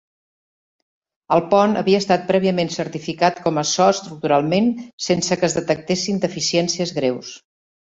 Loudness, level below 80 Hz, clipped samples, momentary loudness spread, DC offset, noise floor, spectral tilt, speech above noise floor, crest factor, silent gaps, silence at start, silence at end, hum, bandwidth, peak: -19 LUFS; -58 dBFS; under 0.1%; 7 LU; under 0.1%; under -90 dBFS; -4.5 dB/octave; over 71 dB; 18 dB; 4.93-4.98 s; 1.3 s; 0.45 s; none; 8 kHz; -2 dBFS